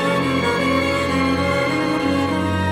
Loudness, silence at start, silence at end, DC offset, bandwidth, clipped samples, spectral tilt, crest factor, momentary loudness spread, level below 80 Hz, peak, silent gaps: -19 LUFS; 0 s; 0 s; under 0.1%; 16 kHz; under 0.1%; -5.5 dB/octave; 12 dB; 2 LU; -42 dBFS; -6 dBFS; none